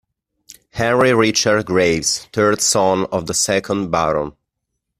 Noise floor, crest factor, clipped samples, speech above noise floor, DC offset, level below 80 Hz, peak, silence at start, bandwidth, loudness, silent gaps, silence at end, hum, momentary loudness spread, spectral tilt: -77 dBFS; 16 dB; under 0.1%; 60 dB; under 0.1%; -48 dBFS; -2 dBFS; 0.75 s; 15.5 kHz; -16 LUFS; none; 0.7 s; none; 6 LU; -3.5 dB/octave